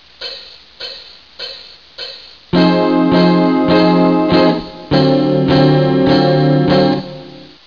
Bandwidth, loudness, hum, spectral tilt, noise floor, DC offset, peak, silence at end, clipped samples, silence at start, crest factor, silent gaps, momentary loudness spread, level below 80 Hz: 5.4 kHz; -12 LUFS; none; -8.5 dB/octave; -35 dBFS; 0.4%; -2 dBFS; 0.2 s; under 0.1%; 0.2 s; 12 dB; none; 18 LU; -42 dBFS